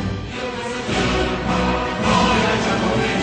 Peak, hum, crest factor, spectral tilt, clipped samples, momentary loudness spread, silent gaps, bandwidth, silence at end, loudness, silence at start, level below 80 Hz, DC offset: -4 dBFS; none; 16 dB; -5 dB/octave; under 0.1%; 10 LU; none; 9.4 kHz; 0 s; -19 LUFS; 0 s; -32 dBFS; under 0.1%